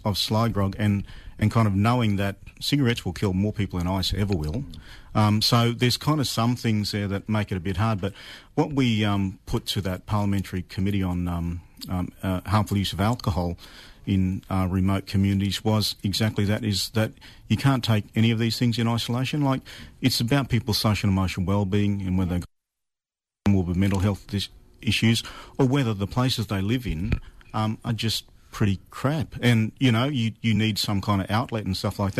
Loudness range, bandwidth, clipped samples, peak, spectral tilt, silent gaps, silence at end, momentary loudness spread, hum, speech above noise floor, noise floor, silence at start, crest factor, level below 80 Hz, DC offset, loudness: 3 LU; 13.5 kHz; under 0.1%; -10 dBFS; -6 dB/octave; none; 0 s; 8 LU; none; 66 dB; -90 dBFS; 0 s; 14 dB; -44 dBFS; under 0.1%; -25 LUFS